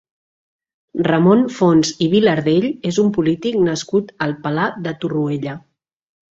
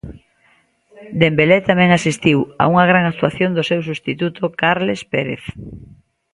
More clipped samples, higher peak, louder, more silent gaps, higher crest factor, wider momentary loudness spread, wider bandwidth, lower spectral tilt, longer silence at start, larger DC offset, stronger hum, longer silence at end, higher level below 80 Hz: neither; about the same, -2 dBFS vs 0 dBFS; about the same, -17 LUFS vs -16 LUFS; neither; about the same, 16 dB vs 18 dB; second, 10 LU vs 14 LU; second, 7.8 kHz vs 11.5 kHz; about the same, -6 dB/octave vs -6 dB/octave; first, 0.95 s vs 0.05 s; neither; neither; first, 0.75 s vs 0.5 s; second, -56 dBFS vs -48 dBFS